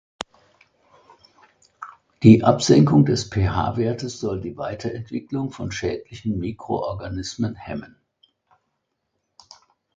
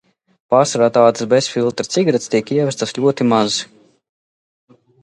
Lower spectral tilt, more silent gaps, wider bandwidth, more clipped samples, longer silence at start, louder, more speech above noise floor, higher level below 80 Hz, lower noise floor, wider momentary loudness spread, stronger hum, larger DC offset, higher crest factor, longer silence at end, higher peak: first, -6.5 dB/octave vs -4.5 dB/octave; neither; second, 9 kHz vs 11.5 kHz; neither; first, 1.8 s vs 0.5 s; second, -21 LUFS vs -16 LUFS; second, 56 dB vs over 75 dB; first, -44 dBFS vs -62 dBFS; second, -76 dBFS vs under -90 dBFS; first, 21 LU vs 6 LU; neither; neither; about the same, 22 dB vs 18 dB; first, 2.1 s vs 1.4 s; about the same, 0 dBFS vs 0 dBFS